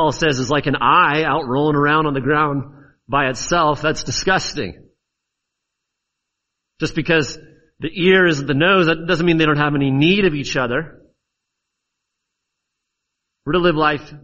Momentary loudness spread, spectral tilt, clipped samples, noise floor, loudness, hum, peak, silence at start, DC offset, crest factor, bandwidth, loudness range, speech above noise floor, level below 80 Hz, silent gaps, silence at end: 13 LU; -5 dB/octave; under 0.1%; -79 dBFS; -17 LUFS; none; -2 dBFS; 0 s; under 0.1%; 18 dB; 8.2 kHz; 9 LU; 62 dB; -42 dBFS; none; 0.05 s